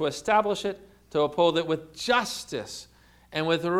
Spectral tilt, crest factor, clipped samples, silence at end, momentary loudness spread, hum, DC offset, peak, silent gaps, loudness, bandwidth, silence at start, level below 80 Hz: -4 dB/octave; 18 dB; under 0.1%; 0 s; 12 LU; 60 Hz at -60 dBFS; under 0.1%; -8 dBFS; none; -27 LUFS; 15.5 kHz; 0 s; -60 dBFS